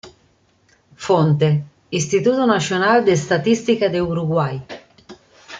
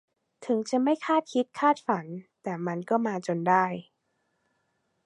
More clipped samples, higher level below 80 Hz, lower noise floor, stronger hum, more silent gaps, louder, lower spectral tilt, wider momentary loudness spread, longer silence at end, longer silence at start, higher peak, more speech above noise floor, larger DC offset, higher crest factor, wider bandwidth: neither; first, -54 dBFS vs -80 dBFS; second, -58 dBFS vs -76 dBFS; neither; neither; first, -18 LUFS vs -27 LUFS; about the same, -5.5 dB/octave vs -6 dB/octave; about the same, 11 LU vs 13 LU; second, 0 s vs 1.25 s; second, 0.05 s vs 0.4 s; first, -4 dBFS vs -8 dBFS; second, 42 dB vs 49 dB; neither; about the same, 16 dB vs 20 dB; second, 9.2 kHz vs 11 kHz